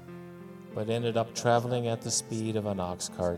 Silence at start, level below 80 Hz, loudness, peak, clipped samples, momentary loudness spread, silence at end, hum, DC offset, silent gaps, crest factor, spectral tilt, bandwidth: 0 s; -64 dBFS; -30 LUFS; -10 dBFS; under 0.1%; 19 LU; 0 s; none; under 0.1%; none; 20 dB; -4.5 dB/octave; 15.5 kHz